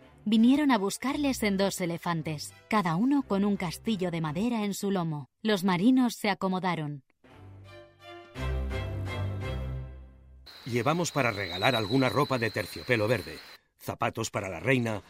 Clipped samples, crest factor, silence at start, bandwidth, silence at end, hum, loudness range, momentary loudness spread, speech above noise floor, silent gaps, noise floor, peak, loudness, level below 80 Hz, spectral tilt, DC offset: under 0.1%; 22 dB; 0.25 s; 16 kHz; 0.1 s; none; 8 LU; 14 LU; 23 dB; none; -51 dBFS; -8 dBFS; -29 LUFS; -46 dBFS; -5.5 dB/octave; under 0.1%